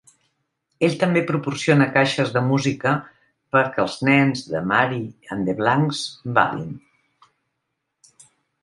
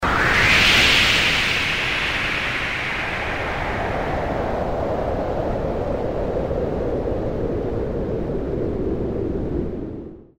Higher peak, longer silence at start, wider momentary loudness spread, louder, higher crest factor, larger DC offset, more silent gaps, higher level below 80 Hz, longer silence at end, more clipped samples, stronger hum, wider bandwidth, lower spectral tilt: first, 0 dBFS vs -4 dBFS; first, 0.8 s vs 0 s; about the same, 10 LU vs 12 LU; about the same, -20 LUFS vs -20 LUFS; about the same, 22 dB vs 18 dB; neither; neither; second, -60 dBFS vs -32 dBFS; first, 1.85 s vs 0.15 s; neither; neither; second, 11.5 kHz vs 16 kHz; first, -6 dB/octave vs -4 dB/octave